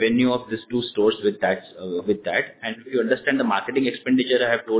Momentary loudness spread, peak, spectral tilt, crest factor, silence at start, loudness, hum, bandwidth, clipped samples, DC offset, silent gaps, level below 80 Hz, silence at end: 8 LU; -6 dBFS; -9 dB/octave; 16 dB; 0 s; -23 LUFS; none; 4 kHz; under 0.1%; under 0.1%; none; -62 dBFS; 0 s